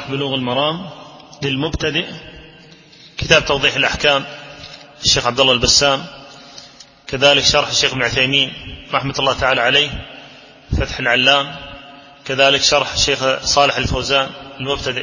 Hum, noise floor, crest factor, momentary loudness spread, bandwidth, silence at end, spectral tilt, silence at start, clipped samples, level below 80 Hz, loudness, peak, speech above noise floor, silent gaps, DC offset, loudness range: none; -43 dBFS; 18 dB; 20 LU; 7.6 kHz; 0 s; -2.5 dB/octave; 0 s; under 0.1%; -36 dBFS; -15 LUFS; 0 dBFS; 27 dB; none; under 0.1%; 3 LU